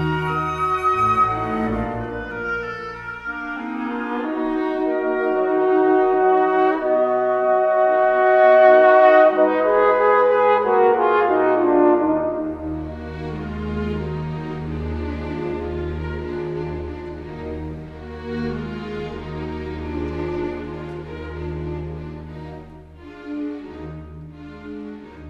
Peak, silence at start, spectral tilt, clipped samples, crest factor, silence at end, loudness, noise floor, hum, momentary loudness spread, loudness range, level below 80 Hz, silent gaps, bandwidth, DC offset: 0 dBFS; 0 s; -8 dB/octave; under 0.1%; 18 dB; 0 s; -19 LUFS; -40 dBFS; none; 18 LU; 16 LU; -40 dBFS; none; 6.8 kHz; under 0.1%